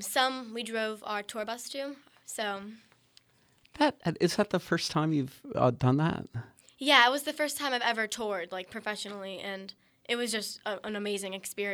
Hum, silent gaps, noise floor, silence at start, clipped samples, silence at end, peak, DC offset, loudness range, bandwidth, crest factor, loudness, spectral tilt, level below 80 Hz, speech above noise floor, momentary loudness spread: none; none; -66 dBFS; 0 s; under 0.1%; 0 s; -6 dBFS; under 0.1%; 8 LU; over 20 kHz; 26 dB; -30 LUFS; -4 dB/octave; -66 dBFS; 35 dB; 13 LU